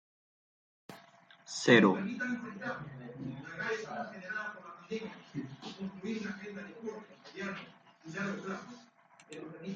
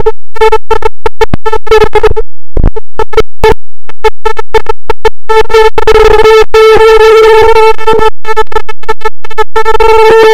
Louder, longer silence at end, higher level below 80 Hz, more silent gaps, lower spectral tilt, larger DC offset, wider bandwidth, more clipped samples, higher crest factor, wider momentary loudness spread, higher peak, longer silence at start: second, -35 LUFS vs -7 LUFS; about the same, 0 s vs 0 s; second, -76 dBFS vs -16 dBFS; neither; about the same, -5 dB/octave vs -4.5 dB/octave; neither; second, 9.4 kHz vs 15 kHz; second, under 0.1% vs 70%; first, 28 dB vs 2 dB; first, 22 LU vs 13 LU; second, -8 dBFS vs 0 dBFS; first, 0.9 s vs 0 s